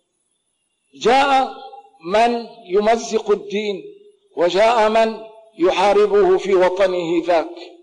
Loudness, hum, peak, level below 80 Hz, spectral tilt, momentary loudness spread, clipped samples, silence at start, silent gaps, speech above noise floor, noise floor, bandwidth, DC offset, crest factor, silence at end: -17 LUFS; none; -10 dBFS; -52 dBFS; -4.5 dB/octave; 12 LU; under 0.1%; 1 s; none; 53 dB; -70 dBFS; 10.5 kHz; under 0.1%; 8 dB; 0.15 s